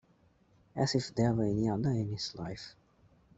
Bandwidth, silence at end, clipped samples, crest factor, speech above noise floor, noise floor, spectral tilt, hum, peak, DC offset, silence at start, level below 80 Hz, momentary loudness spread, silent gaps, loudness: 8.2 kHz; 0.65 s; under 0.1%; 18 dB; 35 dB; -67 dBFS; -6 dB/octave; none; -16 dBFS; under 0.1%; 0.75 s; -58 dBFS; 15 LU; none; -33 LUFS